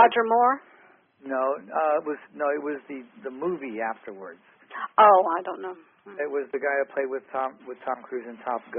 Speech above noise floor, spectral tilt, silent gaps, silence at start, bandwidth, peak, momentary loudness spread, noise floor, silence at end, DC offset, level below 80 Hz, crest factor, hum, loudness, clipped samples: 31 dB; 2.5 dB/octave; none; 0 s; 3.7 kHz; -4 dBFS; 21 LU; -57 dBFS; 0 s; under 0.1%; -80 dBFS; 22 dB; none; -25 LUFS; under 0.1%